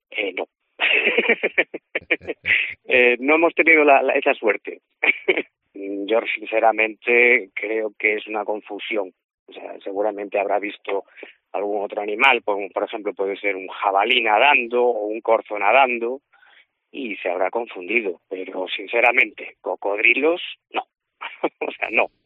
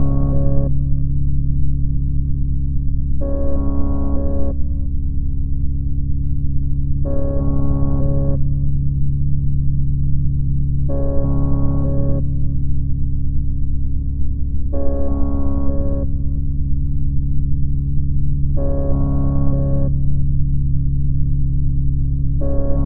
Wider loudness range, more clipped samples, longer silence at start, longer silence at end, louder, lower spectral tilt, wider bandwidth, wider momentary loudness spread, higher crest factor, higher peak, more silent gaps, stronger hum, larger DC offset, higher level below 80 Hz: first, 8 LU vs 3 LU; neither; about the same, 0.1 s vs 0 s; first, 0.2 s vs 0 s; about the same, -20 LUFS vs -21 LUFS; second, 1 dB/octave vs -16 dB/octave; first, 4.1 kHz vs 1.6 kHz; first, 14 LU vs 4 LU; first, 20 dB vs 14 dB; about the same, -2 dBFS vs 0 dBFS; first, 9.24-9.46 s vs none; neither; neither; second, -72 dBFS vs -18 dBFS